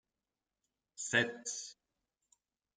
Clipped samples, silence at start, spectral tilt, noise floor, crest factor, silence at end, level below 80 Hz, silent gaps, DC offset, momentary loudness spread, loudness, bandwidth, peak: under 0.1%; 1 s; -2 dB/octave; under -90 dBFS; 26 dB; 1.05 s; -84 dBFS; none; under 0.1%; 13 LU; -36 LUFS; 10 kHz; -16 dBFS